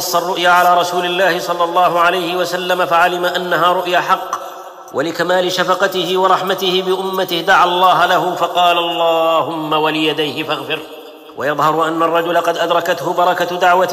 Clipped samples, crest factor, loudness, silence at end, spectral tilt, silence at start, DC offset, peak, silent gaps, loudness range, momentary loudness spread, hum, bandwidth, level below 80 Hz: under 0.1%; 12 dB; -14 LUFS; 0 s; -3.5 dB/octave; 0 s; under 0.1%; -2 dBFS; none; 3 LU; 9 LU; none; 15.5 kHz; -60 dBFS